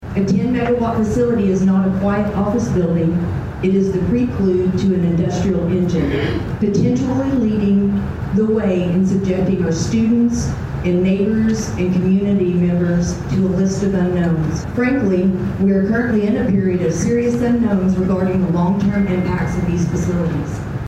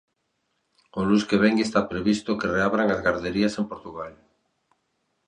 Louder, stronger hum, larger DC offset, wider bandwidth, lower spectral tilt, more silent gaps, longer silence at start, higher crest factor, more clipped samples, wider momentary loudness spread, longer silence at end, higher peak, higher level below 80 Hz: first, -17 LUFS vs -23 LUFS; neither; neither; second, 8.6 kHz vs 10 kHz; first, -7.5 dB/octave vs -6 dB/octave; neither; second, 0 s vs 0.95 s; second, 10 dB vs 20 dB; neither; second, 4 LU vs 16 LU; second, 0 s vs 1.15 s; about the same, -6 dBFS vs -6 dBFS; first, -34 dBFS vs -54 dBFS